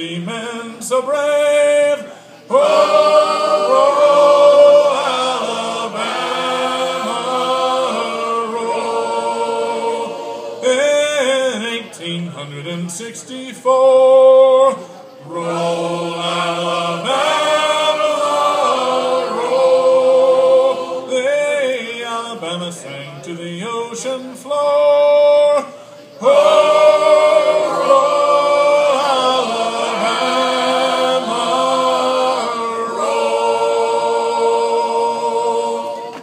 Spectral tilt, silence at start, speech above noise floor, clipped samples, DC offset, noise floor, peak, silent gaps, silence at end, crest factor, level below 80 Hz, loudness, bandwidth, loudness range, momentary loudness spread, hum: -3.5 dB/octave; 0 s; 23 dB; under 0.1%; under 0.1%; -36 dBFS; 0 dBFS; none; 0 s; 14 dB; -78 dBFS; -15 LUFS; 15 kHz; 7 LU; 14 LU; none